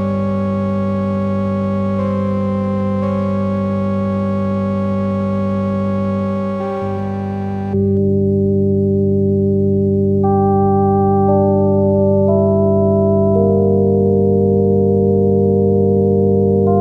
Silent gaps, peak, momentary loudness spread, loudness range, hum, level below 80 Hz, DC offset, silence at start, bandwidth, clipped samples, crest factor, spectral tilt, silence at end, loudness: none; -2 dBFS; 5 LU; 5 LU; 50 Hz at -55 dBFS; -44 dBFS; under 0.1%; 0 s; 4.6 kHz; under 0.1%; 12 dB; -11.5 dB/octave; 0 s; -15 LUFS